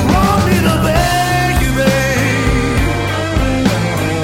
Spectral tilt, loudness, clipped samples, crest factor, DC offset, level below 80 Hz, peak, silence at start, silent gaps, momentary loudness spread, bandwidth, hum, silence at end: -5.5 dB/octave; -14 LUFS; under 0.1%; 12 dB; under 0.1%; -22 dBFS; 0 dBFS; 0 s; none; 4 LU; 16.5 kHz; none; 0 s